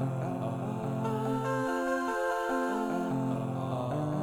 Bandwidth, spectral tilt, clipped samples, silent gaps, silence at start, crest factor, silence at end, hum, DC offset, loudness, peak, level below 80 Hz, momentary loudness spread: 17 kHz; -7 dB/octave; under 0.1%; none; 0 s; 14 dB; 0 s; none; under 0.1%; -32 LUFS; -18 dBFS; -62 dBFS; 3 LU